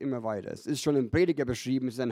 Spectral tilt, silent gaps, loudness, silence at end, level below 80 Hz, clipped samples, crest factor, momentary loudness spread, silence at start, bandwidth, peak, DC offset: -6 dB/octave; none; -29 LUFS; 0 s; -56 dBFS; under 0.1%; 16 dB; 8 LU; 0 s; 16 kHz; -12 dBFS; under 0.1%